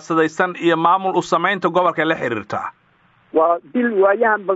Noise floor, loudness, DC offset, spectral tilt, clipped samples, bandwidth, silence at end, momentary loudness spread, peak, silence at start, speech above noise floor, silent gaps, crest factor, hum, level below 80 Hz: -56 dBFS; -18 LUFS; under 0.1%; -3.5 dB/octave; under 0.1%; 8 kHz; 0 s; 8 LU; 0 dBFS; 0.05 s; 39 dB; none; 18 dB; none; -66 dBFS